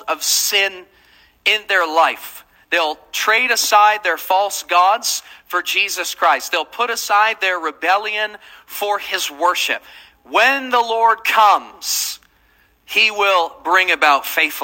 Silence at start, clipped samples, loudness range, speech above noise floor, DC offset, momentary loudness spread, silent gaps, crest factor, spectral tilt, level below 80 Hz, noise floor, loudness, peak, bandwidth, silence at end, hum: 0 s; under 0.1%; 3 LU; 39 dB; under 0.1%; 8 LU; none; 18 dB; 1.5 dB/octave; -64 dBFS; -56 dBFS; -16 LUFS; 0 dBFS; 17 kHz; 0 s; none